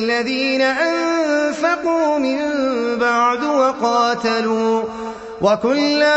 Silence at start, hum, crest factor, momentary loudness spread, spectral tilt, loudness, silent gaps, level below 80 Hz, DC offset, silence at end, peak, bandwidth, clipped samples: 0 s; none; 14 dB; 3 LU; -4 dB/octave; -17 LUFS; none; -56 dBFS; under 0.1%; 0 s; -4 dBFS; 8.4 kHz; under 0.1%